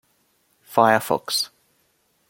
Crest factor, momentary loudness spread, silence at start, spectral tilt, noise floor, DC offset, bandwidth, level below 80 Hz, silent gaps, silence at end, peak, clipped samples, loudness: 22 dB; 8 LU; 0.7 s; -3 dB/octave; -66 dBFS; under 0.1%; 17 kHz; -68 dBFS; none; 0.85 s; -2 dBFS; under 0.1%; -21 LUFS